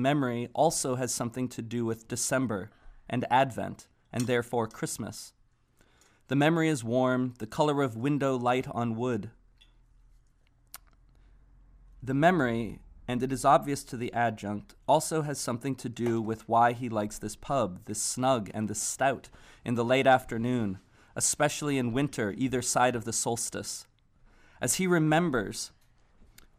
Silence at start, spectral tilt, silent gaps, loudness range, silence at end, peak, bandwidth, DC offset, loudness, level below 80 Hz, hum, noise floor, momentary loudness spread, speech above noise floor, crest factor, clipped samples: 0 s; -4.5 dB/octave; none; 4 LU; 0.35 s; -10 dBFS; 15.5 kHz; under 0.1%; -29 LUFS; -58 dBFS; none; -65 dBFS; 13 LU; 36 dB; 20 dB; under 0.1%